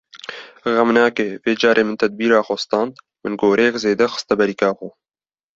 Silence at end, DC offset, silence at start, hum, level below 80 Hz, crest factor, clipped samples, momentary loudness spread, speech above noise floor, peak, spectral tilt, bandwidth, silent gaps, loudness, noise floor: 0.7 s; under 0.1%; 0.15 s; none; -60 dBFS; 18 dB; under 0.1%; 15 LU; over 73 dB; -2 dBFS; -4.5 dB/octave; 7.8 kHz; none; -18 LUFS; under -90 dBFS